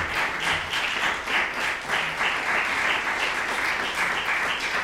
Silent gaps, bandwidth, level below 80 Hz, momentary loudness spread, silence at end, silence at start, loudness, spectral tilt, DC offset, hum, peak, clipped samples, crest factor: none; 16 kHz; -52 dBFS; 2 LU; 0 s; 0 s; -24 LUFS; -1.5 dB/octave; under 0.1%; none; -10 dBFS; under 0.1%; 14 dB